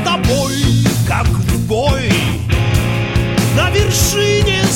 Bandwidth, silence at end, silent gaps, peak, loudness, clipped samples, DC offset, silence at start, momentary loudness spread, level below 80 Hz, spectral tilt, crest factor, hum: 16.5 kHz; 0 s; none; -2 dBFS; -14 LUFS; under 0.1%; under 0.1%; 0 s; 3 LU; -24 dBFS; -4.5 dB/octave; 12 dB; none